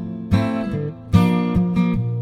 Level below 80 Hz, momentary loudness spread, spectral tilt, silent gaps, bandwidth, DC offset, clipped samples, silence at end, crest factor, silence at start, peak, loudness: -36 dBFS; 7 LU; -8.5 dB/octave; none; 12.5 kHz; under 0.1%; under 0.1%; 0 s; 18 dB; 0 s; -2 dBFS; -20 LUFS